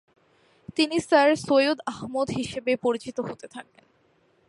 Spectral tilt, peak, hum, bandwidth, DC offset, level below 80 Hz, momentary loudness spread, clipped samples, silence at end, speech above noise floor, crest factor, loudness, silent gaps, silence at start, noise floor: -4.5 dB/octave; -6 dBFS; none; 11.5 kHz; under 0.1%; -62 dBFS; 15 LU; under 0.1%; 0.85 s; 40 dB; 20 dB; -24 LUFS; none; 0.7 s; -64 dBFS